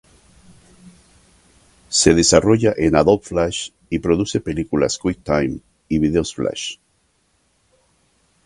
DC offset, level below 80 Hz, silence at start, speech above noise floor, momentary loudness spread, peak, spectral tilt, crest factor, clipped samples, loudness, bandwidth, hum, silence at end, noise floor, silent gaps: under 0.1%; -40 dBFS; 0.85 s; 46 dB; 13 LU; 0 dBFS; -4.5 dB/octave; 20 dB; under 0.1%; -18 LUFS; 11.5 kHz; none; 1.7 s; -63 dBFS; none